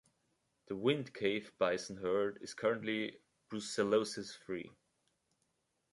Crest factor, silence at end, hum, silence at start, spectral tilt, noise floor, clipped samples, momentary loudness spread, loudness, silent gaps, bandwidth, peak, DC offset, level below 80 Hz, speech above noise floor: 20 dB; 1.25 s; none; 0.7 s; -4.5 dB/octave; -81 dBFS; under 0.1%; 12 LU; -37 LUFS; none; 11.5 kHz; -18 dBFS; under 0.1%; -76 dBFS; 45 dB